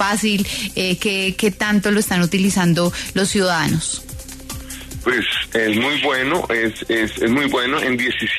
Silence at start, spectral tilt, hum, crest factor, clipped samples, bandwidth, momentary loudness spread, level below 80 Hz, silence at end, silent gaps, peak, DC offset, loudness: 0 s; -4 dB/octave; none; 14 dB; under 0.1%; 13.5 kHz; 8 LU; -42 dBFS; 0 s; none; -4 dBFS; under 0.1%; -18 LUFS